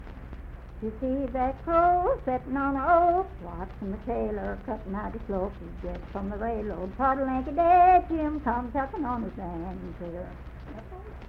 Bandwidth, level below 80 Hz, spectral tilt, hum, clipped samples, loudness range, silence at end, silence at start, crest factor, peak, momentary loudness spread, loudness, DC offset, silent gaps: 5 kHz; -42 dBFS; -9.5 dB/octave; none; under 0.1%; 8 LU; 0 s; 0 s; 18 dB; -10 dBFS; 20 LU; -27 LUFS; under 0.1%; none